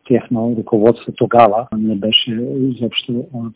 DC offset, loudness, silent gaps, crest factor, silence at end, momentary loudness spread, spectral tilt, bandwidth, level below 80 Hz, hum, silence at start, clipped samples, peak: under 0.1%; -15 LUFS; none; 16 dB; 0.05 s; 9 LU; -10 dB/octave; 4 kHz; -52 dBFS; none; 0.1 s; 0.4%; 0 dBFS